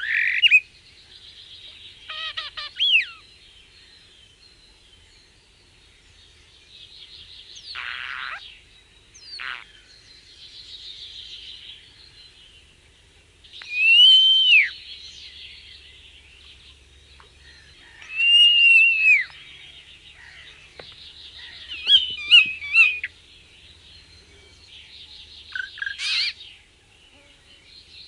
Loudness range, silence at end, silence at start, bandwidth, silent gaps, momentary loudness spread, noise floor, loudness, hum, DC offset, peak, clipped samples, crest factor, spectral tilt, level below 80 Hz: 21 LU; 1.65 s; 0 s; 11.5 kHz; none; 29 LU; -55 dBFS; -15 LUFS; none; under 0.1%; -4 dBFS; under 0.1%; 20 dB; 1.5 dB/octave; -60 dBFS